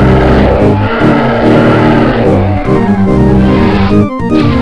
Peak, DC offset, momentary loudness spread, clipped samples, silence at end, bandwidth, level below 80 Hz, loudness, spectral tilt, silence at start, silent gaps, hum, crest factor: 0 dBFS; under 0.1%; 3 LU; under 0.1%; 0 s; 10 kHz; -18 dBFS; -8 LUFS; -8.5 dB/octave; 0 s; none; none; 6 dB